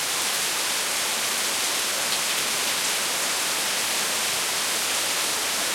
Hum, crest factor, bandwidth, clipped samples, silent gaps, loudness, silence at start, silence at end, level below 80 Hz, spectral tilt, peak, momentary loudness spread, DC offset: none; 16 dB; 16.5 kHz; under 0.1%; none; -22 LUFS; 0 s; 0 s; -66 dBFS; 1 dB/octave; -10 dBFS; 1 LU; under 0.1%